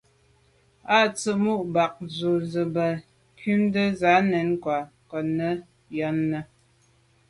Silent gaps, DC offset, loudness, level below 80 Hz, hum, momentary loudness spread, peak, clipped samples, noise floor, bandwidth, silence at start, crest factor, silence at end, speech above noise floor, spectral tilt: none; under 0.1%; -25 LUFS; -62 dBFS; none; 13 LU; -8 dBFS; under 0.1%; -62 dBFS; 11.5 kHz; 0.85 s; 18 dB; 0.85 s; 38 dB; -6 dB/octave